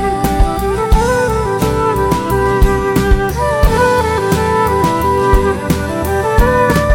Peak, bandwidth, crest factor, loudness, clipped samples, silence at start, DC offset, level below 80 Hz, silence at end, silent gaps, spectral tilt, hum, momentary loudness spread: 0 dBFS; 17 kHz; 12 dB; -13 LUFS; under 0.1%; 0 s; under 0.1%; -18 dBFS; 0 s; none; -6 dB/octave; none; 3 LU